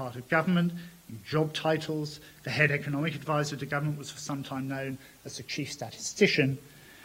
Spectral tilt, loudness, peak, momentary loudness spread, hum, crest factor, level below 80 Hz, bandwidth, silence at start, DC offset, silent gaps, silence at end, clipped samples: -5 dB/octave; -30 LUFS; -8 dBFS; 15 LU; none; 22 dB; -66 dBFS; 16 kHz; 0 s; under 0.1%; none; 0 s; under 0.1%